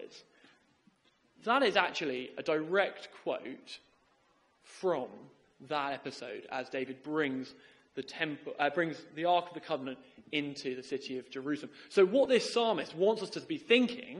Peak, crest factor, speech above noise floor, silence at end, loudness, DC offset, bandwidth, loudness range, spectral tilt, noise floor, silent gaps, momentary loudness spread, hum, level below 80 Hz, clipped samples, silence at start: -10 dBFS; 24 dB; 37 dB; 0 s; -33 LUFS; under 0.1%; 11.5 kHz; 7 LU; -4.5 dB/octave; -70 dBFS; none; 16 LU; none; -80 dBFS; under 0.1%; 0 s